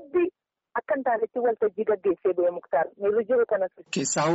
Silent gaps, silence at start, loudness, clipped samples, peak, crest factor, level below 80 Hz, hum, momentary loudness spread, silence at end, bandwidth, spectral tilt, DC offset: none; 0 s; -26 LUFS; under 0.1%; -14 dBFS; 12 dB; -68 dBFS; none; 6 LU; 0 s; 8 kHz; -4.5 dB/octave; under 0.1%